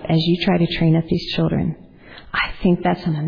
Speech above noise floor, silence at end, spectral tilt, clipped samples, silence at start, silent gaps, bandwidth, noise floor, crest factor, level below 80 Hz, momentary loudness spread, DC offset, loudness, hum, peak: 23 dB; 0 s; -8.5 dB/octave; under 0.1%; 0 s; none; 5.4 kHz; -41 dBFS; 14 dB; -40 dBFS; 7 LU; under 0.1%; -19 LUFS; none; -4 dBFS